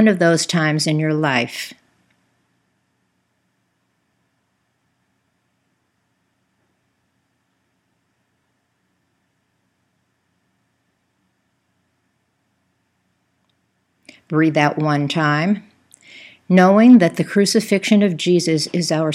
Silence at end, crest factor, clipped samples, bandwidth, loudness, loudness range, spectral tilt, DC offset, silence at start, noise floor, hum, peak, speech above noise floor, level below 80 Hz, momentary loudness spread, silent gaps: 0 s; 20 dB; under 0.1%; 15 kHz; -16 LUFS; 12 LU; -5.5 dB/octave; under 0.1%; 0 s; -68 dBFS; none; 0 dBFS; 53 dB; -74 dBFS; 14 LU; none